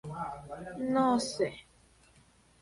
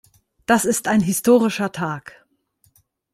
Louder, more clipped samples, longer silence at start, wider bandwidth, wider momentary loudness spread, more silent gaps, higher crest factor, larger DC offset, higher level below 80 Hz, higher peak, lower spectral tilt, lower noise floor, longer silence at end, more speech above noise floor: second, -32 LUFS vs -19 LUFS; neither; second, 0.05 s vs 0.5 s; second, 11.5 kHz vs 16 kHz; first, 16 LU vs 12 LU; neither; about the same, 18 dB vs 18 dB; neither; second, -64 dBFS vs -58 dBFS; second, -16 dBFS vs -4 dBFS; about the same, -5 dB/octave vs -4.5 dB/octave; about the same, -63 dBFS vs -63 dBFS; about the same, 1 s vs 1.05 s; second, 33 dB vs 45 dB